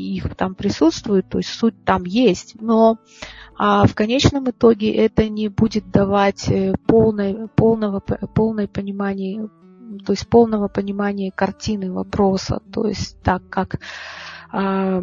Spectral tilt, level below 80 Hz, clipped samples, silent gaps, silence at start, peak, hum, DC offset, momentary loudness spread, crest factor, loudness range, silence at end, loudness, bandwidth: -6.5 dB/octave; -40 dBFS; under 0.1%; none; 0 s; 0 dBFS; none; under 0.1%; 12 LU; 18 dB; 5 LU; 0 s; -19 LUFS; 7.6 kHz